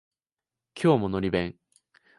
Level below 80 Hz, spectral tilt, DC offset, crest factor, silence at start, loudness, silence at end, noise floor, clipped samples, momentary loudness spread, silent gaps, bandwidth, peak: -52 dBFS; -7.5 dB/octave; under 0.1%; 20 dB; 0.75 s; -26 LUFS; 0.7 s; under -90 dBFS; under 0.1%; 13 LU; none; 11.5 kHz; -8 dBFS